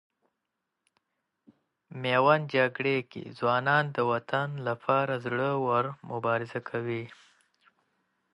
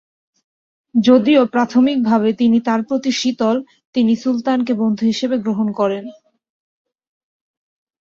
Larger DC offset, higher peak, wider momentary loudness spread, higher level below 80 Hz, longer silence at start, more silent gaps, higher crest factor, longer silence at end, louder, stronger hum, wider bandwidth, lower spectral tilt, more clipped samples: neither; second, -8 dBFS vs -2 dBFS; first, 11 LU vs 7 LU; second, -74 dBFS vs -62 dBFS; first, 1.9 s vs 0.95 s; second, none vs 3.85-3.93 s; first, 22 dB vs 16 dB; second, 1.2 s vs 1.9 s; second, -28 LUFS vs -16 LUFS; neither; first, 11 kHz vs 7.4 kHz; first, -7.5 dB/octave vs -5.5 dB/octave; neither